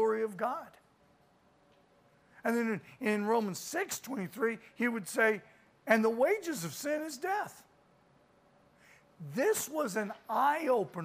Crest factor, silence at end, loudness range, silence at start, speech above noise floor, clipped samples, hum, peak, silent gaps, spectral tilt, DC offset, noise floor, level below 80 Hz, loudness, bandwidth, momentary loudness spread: 22 dB; 0 s; 5 LU; 0 s; 34 dB; under 0.1%; none; -12 dBFS; none; -4 dB/octave; under 0.1%; -67 dBFS; -80 dBFS; -33 LUFS; 15.5 kHz; 9 LU